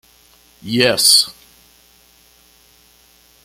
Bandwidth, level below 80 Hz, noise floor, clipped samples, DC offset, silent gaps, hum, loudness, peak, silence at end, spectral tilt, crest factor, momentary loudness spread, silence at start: 17 kHz; -58 dBFS; -51 dBFS; under 0.1%; under 0.1%; none; none; -12 LUFS; 0 dBFS; 2.15 s; -1.5 dB/octave; 20 dB; 15 LU; 0.65 s